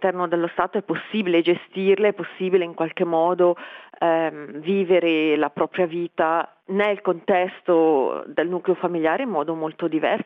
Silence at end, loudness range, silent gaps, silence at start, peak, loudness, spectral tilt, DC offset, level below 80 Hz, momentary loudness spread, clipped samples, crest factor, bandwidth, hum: 0 s; 1 LU; none; 0 s; -4 dBFS; -22 LUFS; -8.5 dB/octave; under 0.1%; -70 dBFS; 7 LU; under 0.1%; 18 dB; 4 kHz; none